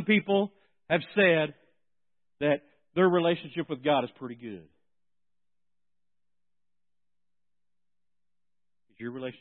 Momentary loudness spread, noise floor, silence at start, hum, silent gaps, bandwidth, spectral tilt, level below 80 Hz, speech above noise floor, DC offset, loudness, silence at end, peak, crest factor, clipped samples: 18 LU; under -90 dBFS; 0 s; none; none; 4.3 kHz; -10 dB/octave; -76 dBFS; over 63 dB; under 0.1%; -27 LUFS; 0.1 s; -10 dBFS; 22 dB; under 0.1%